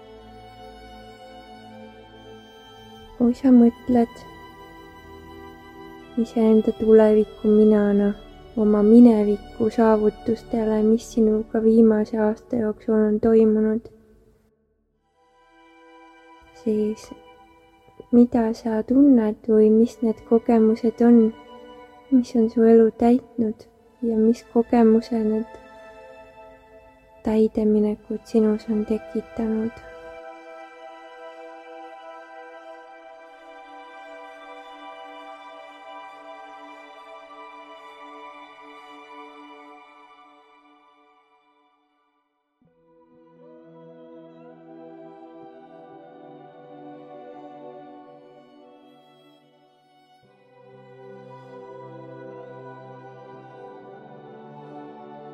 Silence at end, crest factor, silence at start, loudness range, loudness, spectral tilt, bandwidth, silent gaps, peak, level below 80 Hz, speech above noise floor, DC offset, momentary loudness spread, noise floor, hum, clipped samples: 0 s; 20 dB; 0.65 s; 24 LU; -19 LUFS; -8 dB/octave; 8.2 kHz; none; -4 dBFS; -54 dBFS; 54 dB; under 0.1%; 27 LU; -72 dBFS; none; under 0.1%